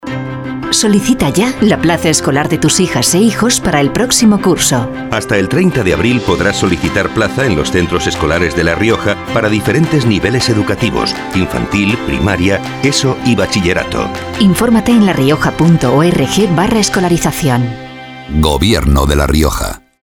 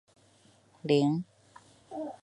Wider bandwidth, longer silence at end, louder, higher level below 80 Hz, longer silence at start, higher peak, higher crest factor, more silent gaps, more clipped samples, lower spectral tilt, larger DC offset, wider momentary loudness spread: first, 18.5 kHz vs 11 kHz; first, 0.25 s vs 0.1 s; first, -12 LUFS vs -30 LUFS; first, -26 dBFS vs -76 dBFS; second, 0 s vs 0.85 s; first, 0 dBFS vs -12 dBFS; second, 12 dB vs 22 dB; neither; neither; second, -4.5 dB/octave vs -7 dB/octave; neither; second, 6 LU vs 19 LU